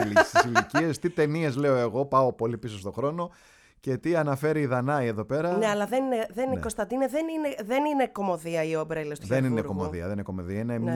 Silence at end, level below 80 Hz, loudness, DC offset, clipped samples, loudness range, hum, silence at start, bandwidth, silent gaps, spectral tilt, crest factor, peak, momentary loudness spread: 0 s; -56 dBFS; -27 LUFS; under 0.1%; under 0.1%; 2 LU; none; 0 s; 18 kHz; none; -6 dB/octave; 22 dB; -6 dBFS; 9 LU